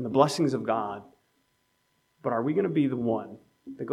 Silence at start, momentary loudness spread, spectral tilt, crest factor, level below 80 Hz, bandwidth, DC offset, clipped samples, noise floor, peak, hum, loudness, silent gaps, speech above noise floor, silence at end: 0 s; 20 LU; -6.5 dB/octave; 24 dB; -72 dBFS; 14 kHz; under 0.1%; under 0.1%; -72 dBFS; -6 dBFS; none; -27 LUFS; none; 45 dB; 0 s